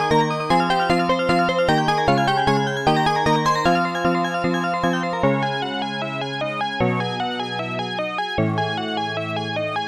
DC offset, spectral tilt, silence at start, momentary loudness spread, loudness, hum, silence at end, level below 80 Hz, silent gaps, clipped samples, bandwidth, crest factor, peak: under 0.1%; -5.5 dB/octave; 0 s; 7 LU; -21 LUFS; none; 0 s; -46 dBFS; none; under 0.1%; 14.5 kHz; 16 dB; -4 dBFS